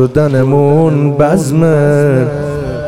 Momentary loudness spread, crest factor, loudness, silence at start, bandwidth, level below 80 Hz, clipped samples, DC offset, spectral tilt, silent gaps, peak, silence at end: 6 LU; 10 dB; -10 LUFS; 0 s; 13 kHz; -36 dBFS; under 0.1%; under 0.1%; -8 dB/octave; none; 0 dBFS; 0 s